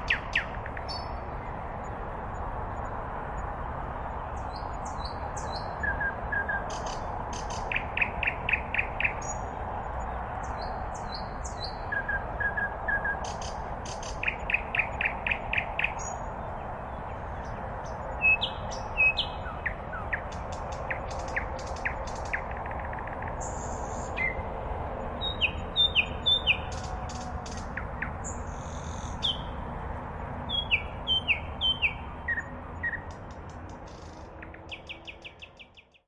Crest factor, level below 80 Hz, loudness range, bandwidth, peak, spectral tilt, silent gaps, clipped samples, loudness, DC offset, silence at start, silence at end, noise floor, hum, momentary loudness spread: 20 dB; -42 dBFS; 8 LU; 11 kHz; -12 dBFS; -3.5 dB/octave; none; under 0.1%; -31 LUFS; under 0.1%; 0 s; 0.25 s; -54 dBFS; none; 12 LU